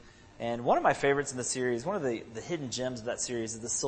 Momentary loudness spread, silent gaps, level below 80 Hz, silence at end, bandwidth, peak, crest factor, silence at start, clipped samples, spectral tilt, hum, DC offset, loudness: 10 LU; none; -62 dBFS; 0 s; 8.8 kHz; -10 dBFS; 20 dB; 0 s; under 0.1%; -3.5 dB/octave; none; under 0.1%; -31 LUFS